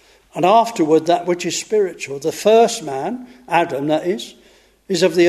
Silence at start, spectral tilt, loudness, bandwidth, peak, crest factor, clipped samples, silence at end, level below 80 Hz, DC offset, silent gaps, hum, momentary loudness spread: 0.35 s; -4.5 dB/octave; -18 LUFS; 13.5 kHz; -2 dBFS; 16 dB; under 0.1%; 0 s; -62 dBFS; under 0.1%; none; none; 12 LU